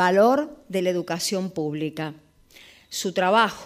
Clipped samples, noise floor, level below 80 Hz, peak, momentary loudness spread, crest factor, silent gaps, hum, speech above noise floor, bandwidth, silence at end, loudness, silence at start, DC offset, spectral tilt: under 0.1%; -51 dBFS; -64 dBFS; -6 dBFS; 12 LU; 18 dB; none; none; 29 dB; 15.5 kHz; 0 s; -24 LUFS; 0 s; under 0.1%; -4.5 dB/octave